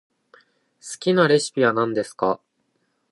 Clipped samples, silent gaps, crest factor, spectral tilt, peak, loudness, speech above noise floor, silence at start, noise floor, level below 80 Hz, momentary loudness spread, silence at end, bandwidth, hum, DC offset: under 0.1%; none; 20 dB; -5 dB/octave; -4 dBFS; -21 LUFS; 50 dB; 0.85 s; -70 dBFS; -70 dBFS; 15 LU; 0.75 s; 11.5 kHz; none; under 0.1%